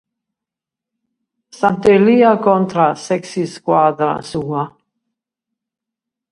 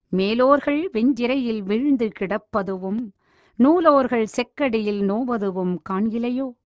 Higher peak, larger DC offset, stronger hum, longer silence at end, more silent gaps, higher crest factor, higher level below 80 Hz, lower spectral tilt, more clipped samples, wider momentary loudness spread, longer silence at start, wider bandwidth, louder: about the same, 0 dBFS vs -2 dBFS; neither; neither; first, 1.65 s vs 0.2 s; neither; about the same, 16 dB vs 18 dB; about the same, -56 dBFS vs -56 dBFS; about the same, -6.5 dB/octave vs -7 dB/octave; neither; first, 12 LU vs 9 LU; first, 1.6 s vs 0.1 s; first, 11.5 kHz vs 8 kHz; first, -15 LUFS vs -21 LUFS